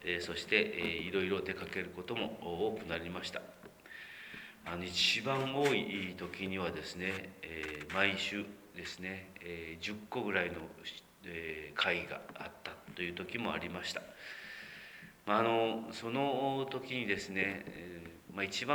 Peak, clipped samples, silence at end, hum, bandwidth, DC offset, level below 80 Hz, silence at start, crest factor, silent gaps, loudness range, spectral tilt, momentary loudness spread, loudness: -14 dBFS; under 0.1%; 0 s; none; over 20 kHz; under 0.1%; -66 dBFS; 0 s; 24 dB; none; 6 LU; -4 dB/octave; 16 LU; -37 LUFS